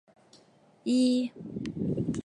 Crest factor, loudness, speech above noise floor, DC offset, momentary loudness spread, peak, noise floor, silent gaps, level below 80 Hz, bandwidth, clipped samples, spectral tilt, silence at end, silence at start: 14 dB; -30 LUFS; 32 dB; under 0.1%; 13 LU; -16 dBFS; -61 dBFS; none; -58 dBFS; 10.5 kHz; under 0.1%; -6.5 dB/octave; 0.05 s; 0.85 s